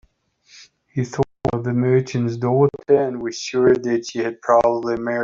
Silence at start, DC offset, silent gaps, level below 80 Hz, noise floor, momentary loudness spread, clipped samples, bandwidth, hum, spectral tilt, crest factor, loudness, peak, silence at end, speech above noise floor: 0.55 s; under 0.1%; none; -52 dBFS; -57 dBFS; 9 LU; under 0.1%; 7.6 kHz; none; -6.5 dB/octave; 16 dB; -20 LUFS; -4 dBFS; 0 s; 39 dB